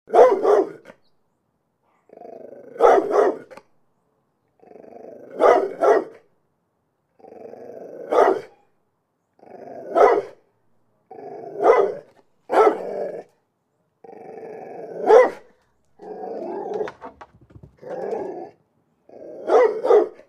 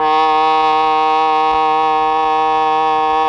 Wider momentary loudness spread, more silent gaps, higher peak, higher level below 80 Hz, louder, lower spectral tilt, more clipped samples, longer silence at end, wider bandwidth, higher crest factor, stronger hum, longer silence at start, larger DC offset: first, 25 LU vs 2 LU; neither; about the same, 0 dBFS vs -2 dBFS; second, -66 dBFS vs -48 dBFS; second, -19 LUFS vs -13 LUFS; about the same, -5 dB/octave vs -4 dB/octave; neither; first, 0.2 s vs 0 s; first, 10.5 kHz vs 7.6 kHz; first, 22 dB vs 12 dB; second, none vs 50 Hz at -55 dBFS; about the same, 0.1 s vs 0 s; neither